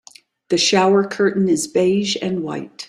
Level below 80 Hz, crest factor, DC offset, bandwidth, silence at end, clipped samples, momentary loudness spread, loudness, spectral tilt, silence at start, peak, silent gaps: -62 dBFS; 14 dB; under 0.1%; 13 kHz; 0.05 s; under 0.1%; 9 LU; -18 LUFS; -4 dB/octave; 0.5 s; -4 dBFS; none